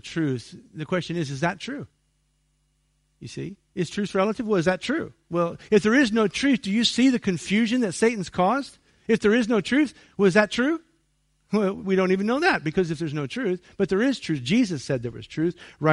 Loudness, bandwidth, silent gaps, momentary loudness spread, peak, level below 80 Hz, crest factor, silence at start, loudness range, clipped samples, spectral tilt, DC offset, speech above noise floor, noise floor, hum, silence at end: -24 LUFS; 11.5 kHz; none; 14 LU; -4 dBFS; -58 dBFS; 20 dB; 0.05 s; 9 LU; under 0.1%; -5.5 dB/octave; under 0.1%; 45 dB; -69 dBFS; none; 0 s